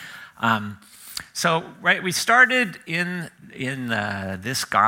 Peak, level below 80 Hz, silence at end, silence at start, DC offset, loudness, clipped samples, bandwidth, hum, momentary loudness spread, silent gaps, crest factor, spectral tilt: -2 dBFS; -66 dBFS; 0 s; 0 s; under 0.1%; -22 LUFS; under 0.1%; 16.5 kHz; none; 19 LU; none; 20 dB; -3 dB/octave